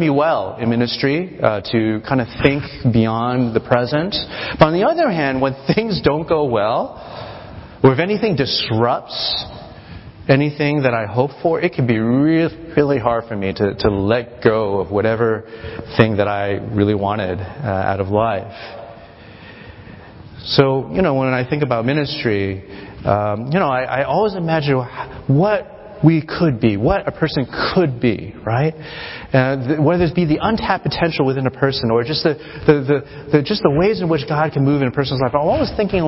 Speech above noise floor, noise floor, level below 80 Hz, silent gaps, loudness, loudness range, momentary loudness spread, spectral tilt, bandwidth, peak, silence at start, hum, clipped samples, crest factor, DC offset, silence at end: 22 dB; -39 dBFS; -40 dBFS; none; -18 LUFS; 2 LU; 10 LU; -10 dB/octave; 5.8 kHz; 0 dBFS; 0 s; none; under 0.1%; 18 dB; under 0.1%; 0 s